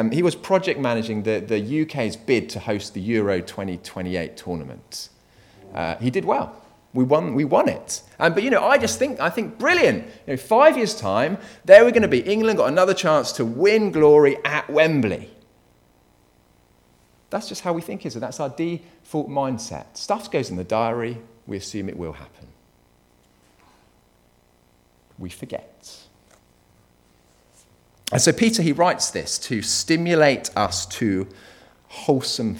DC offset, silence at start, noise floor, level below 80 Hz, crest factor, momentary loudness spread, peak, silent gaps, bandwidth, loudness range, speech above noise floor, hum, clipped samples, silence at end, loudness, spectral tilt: under 0.1%; 0 s; -59 dBFS; -56 dBFS; 22 dB; 16 LU; 0 dBFS; none; 18.5 kHz; 20 LU; 39 dB; none; under 0.1%; 0 s; -20 LUFS; -4.5 dB/octave